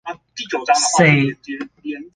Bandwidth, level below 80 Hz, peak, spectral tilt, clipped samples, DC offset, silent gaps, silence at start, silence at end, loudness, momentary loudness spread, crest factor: 10 kHz; -56 dBFS; -2 dBFS; -4 dB/octave; under 0.1%; under 0.1%; none; 0.05 s; 0.05 s; -15 LUFS; 18 LU; 16 dB